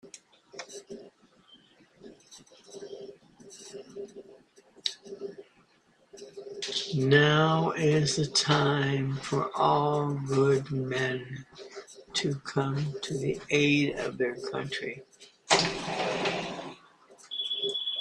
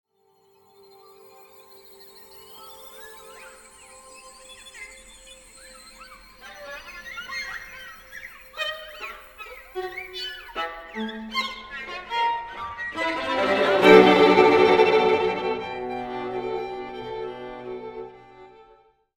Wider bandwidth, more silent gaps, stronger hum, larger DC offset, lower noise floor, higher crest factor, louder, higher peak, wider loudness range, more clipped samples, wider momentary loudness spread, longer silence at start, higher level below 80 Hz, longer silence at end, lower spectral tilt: second, 11 kHz vs 18.5 kHz; neither; neither; neither; about the same, -65 dBFS vs -63 dBFS; about the same, 24 dB vs 24 dB; second, -28 LUFS vs -22 LUFS; second, -6 dBFS vs -2 dBFS; second, 22 LU vs 26 LU; neither; second, 21 LU vs 28 LU; second, 0.05 s vs 2 s; second, -64 dBFS vs -58 dBFS; second, 0 s vs 0.75 s; about the same, -4.5 dB/octave vs -5 dB/octave